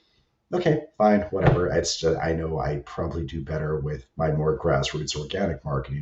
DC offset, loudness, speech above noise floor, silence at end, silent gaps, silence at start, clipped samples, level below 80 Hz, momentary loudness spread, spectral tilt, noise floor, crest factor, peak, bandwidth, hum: under 0.1%; -25 LUFS; 42 dB; 0 s; none; 0.5 s; under 0.1%; -40 dBFS; 9 LU; -5.5 dB/octave; -67 dBFS; 18 dB; -6 dBFS; 8.2 kHz; none